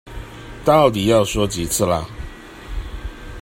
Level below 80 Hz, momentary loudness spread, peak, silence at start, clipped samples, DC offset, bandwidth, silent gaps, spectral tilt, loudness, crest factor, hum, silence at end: -34 dBFS; 22 LU; 0 dBFS; 0.05 s; under 0.1%; under 0.1%; 16 kHz; none; -4.5 dB/octave; -17 LUFS; 20 dB; none; 0 s